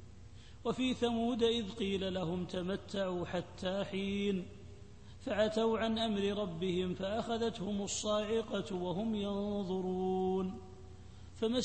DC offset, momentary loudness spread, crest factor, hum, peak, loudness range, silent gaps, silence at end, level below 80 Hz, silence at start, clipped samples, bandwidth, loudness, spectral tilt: 0.1%; 20 LU; 16 dB; none; -20 dBFS; 3 LU; none; 0 s; -60 dBFS; 0 s; under 0.1%; 8.4 kHz; -36 LUFS; -5 dB/octave